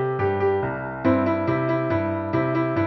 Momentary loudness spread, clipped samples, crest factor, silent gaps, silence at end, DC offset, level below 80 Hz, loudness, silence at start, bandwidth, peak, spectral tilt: 3 LU; under 0.1%; 14 dB; none; 0 s; under 0.1%; -52 dBFS; -23 LUFS; 0 s; 6 kHz; -8 dBFS; -10 dB/octave